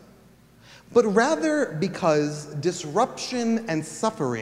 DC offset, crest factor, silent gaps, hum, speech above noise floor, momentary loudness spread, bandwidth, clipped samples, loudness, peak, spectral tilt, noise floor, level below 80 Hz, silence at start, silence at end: under 0.1%; 18 dB; none; none; 30 dB; 7 LU; 14 kHz; under 0.1%; -24 LUFS; -6 dBFS; -5 dB/octave; -53 dBFS; -64 dBFS; 0.7 s; 0 s